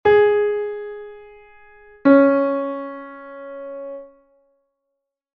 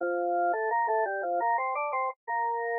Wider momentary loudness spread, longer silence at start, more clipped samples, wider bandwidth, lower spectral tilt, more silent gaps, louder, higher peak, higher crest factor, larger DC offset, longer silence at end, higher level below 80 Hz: first, 23 LU vs 4 LU; about the same, 0.05 s vs 0 s; neither; first, 5 kHz vs 2.6 kHz; first, -8.5 dB/octave vs 7.5 dB/octave; second, none vs 2.16-2.27 s; first, -17 LUFS vs -29 LUFS; first, -2 dBFS vs -18 dBFS; first, 20 dB vs 10 dB; neither; first, 1.3 s vs 0 s; first, -58 dBFS vs under -90 dBFS